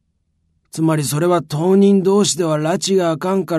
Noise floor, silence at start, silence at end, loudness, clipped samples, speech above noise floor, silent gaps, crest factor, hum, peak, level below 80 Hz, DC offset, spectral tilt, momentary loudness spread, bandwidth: -66 dBFS; 0.75 s; 0 s; -16 LUFS; under 0.1%; 50 dB; none; 12 dB; none; -4 dBFS; -60 dBFS; under 0.1%; -5.5 dB/octave; 6 LU; 13.5 kHz